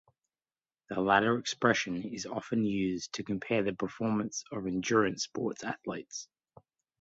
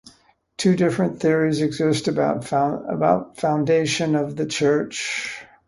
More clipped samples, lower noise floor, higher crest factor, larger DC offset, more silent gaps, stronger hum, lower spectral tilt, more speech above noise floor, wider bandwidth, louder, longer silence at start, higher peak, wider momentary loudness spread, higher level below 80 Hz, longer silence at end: neither; first, under -90 dBFS vs -56 dBFS; first, 24 dB vs 18 dB; neither; neither; neither; about the same, -4.5 dB/octave vs -5.5 dB/octave; first, over 58 dB vs 36 dB; second, 8 kHz vs 11.5 kHz; second, -32 LUFS vs -21 LUFS; first, 0.9 s vs 0.6 s; second, -10 dBFS vs -4 dBFS; first, 12 LU vs 6 LU; second, -66 dBFS vs -58 dBFS; first, 0.8 s vs 0.25 s